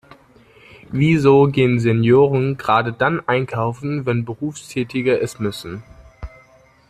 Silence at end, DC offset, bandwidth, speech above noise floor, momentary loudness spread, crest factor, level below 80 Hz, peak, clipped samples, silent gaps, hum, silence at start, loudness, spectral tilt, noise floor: 0.6 s; under 0.1%; 13.5 kHz; 34 dB; 19 LU; 16 dB; -48 dBFS; -2 dBFS; under 0.1%; none; none; 0.9 s; -18 LUFS; -7 dB/octave; -51 dBFS